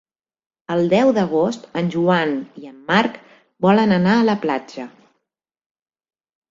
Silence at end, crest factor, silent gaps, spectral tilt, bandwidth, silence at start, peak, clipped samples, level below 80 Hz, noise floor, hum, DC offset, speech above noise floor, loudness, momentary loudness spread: 1.65 s; 16 dB; none; -7 dB/octave; 7.6 kHz; 0.7 s; -4 dBFS; under 0.1%; -60 dBFS; -80 dBFS; none; under 0.1%; 62 dB; -18 LUFS; 17 LU